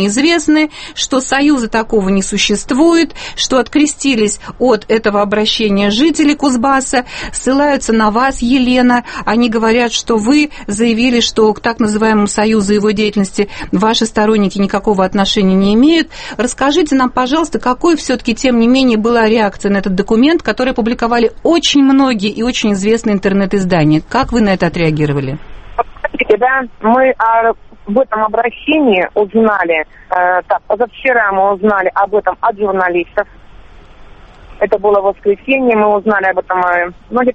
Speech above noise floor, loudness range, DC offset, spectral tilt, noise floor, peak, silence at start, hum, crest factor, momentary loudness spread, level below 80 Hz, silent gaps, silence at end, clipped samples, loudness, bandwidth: 24 dB; 2 LU; under 0.1%; -4.5 dB/octave; -36 dBFS; 0 dBFS; 0 s; none; 12 dB; 6 LU; -36 dBFS; none; 0 s; under 0.1%; -12 LUFS; 8.8 kHz